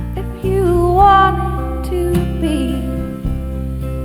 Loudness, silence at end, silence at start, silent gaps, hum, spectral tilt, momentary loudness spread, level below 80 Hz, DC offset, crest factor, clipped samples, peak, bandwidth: -16 LUFS; 0 s; 0 s; none; none; -7 dB/octave; 13 LU; -22 dBFS; under 0.1%; 16 dB; under 0.1%; 0 dBFS; 15.5 kHz